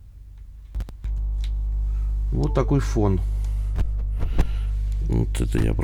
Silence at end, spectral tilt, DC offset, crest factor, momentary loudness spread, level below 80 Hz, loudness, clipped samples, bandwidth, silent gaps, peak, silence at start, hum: 0 s; -7.5 dB/octave; under 0.1%; 16 dB; 13 LU; -24 dBFS; -26 LUFS; under 0.1%; 11.5 kHz; none; -6 dBFS; 0 s; 50 Hz at -25 dBFS